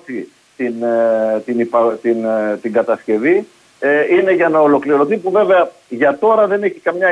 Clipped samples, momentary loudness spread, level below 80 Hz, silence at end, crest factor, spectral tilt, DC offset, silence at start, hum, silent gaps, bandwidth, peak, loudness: under 0.1%; 7 LU; -66 dBFS; 0 s; 12 dB; -7 dB/octave; under 0.1%; 0.1 s; none; none; 11 kHz; -2 dBFS; -15 LUFS